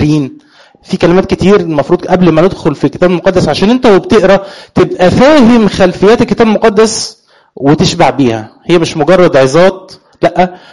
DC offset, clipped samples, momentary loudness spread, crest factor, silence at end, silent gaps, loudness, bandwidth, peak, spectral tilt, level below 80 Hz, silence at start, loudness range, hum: 2%; 0.2%; 7 LU; 8 dB; 0.15 s; none; -8 LUFS; 11.5 kHz; 0 dBFS; -6 dB/octave; -34 dBFS; 0 s; 2 LU; none